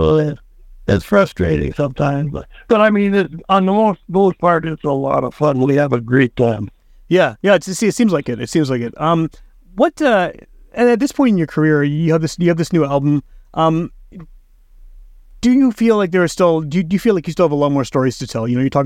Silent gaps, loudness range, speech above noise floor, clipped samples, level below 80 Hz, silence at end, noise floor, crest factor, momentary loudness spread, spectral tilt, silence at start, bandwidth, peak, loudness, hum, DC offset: none; 2 LU; 29 dB; under 0.1%; -40 dBFS; 0 s; -44 dBFS; 16 dB; 7 LU; -6.5 dB/octave; 0 s; 16 kHz; 0 dBFS; -16 LUFS; none; under 0.1%